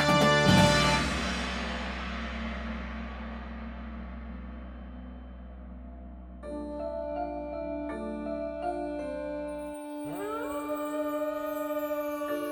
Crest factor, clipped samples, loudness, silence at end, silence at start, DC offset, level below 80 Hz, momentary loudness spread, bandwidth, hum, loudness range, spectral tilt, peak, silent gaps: 22 dB; under 0.1%; -31 LUFS; 0 s; 0 s; under 0.1%; -44 dBFS; 22 LU; over 20 kHz; none; 14 LU; -5 dB/octave; -8 dBFS; none